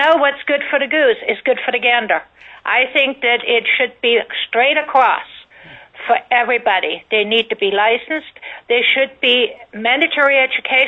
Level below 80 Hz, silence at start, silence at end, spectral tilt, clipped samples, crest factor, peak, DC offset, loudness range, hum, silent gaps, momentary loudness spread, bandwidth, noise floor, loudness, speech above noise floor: -62 dBFS; 0 s; 0 s; -4.5 dB/octave; under 0.1%; 14 dB; -2 dBFS; under 0.1%; 2 LU; none; none; 7 LU; 6.8 kHz; -41 dBFS; -15 LUFS; 25 dB